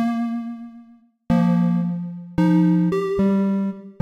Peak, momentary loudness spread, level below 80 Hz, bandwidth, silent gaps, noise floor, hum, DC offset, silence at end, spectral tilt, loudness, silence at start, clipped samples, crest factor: -8 dBFS; 12 LU; -48 dBFS; 6.2 kHz; none; -50 dBFS; none; under 0.1%; 0.1 s; -9.5 dB/octave; -21 LUFS; 0 s; under 0.1%; 12 dB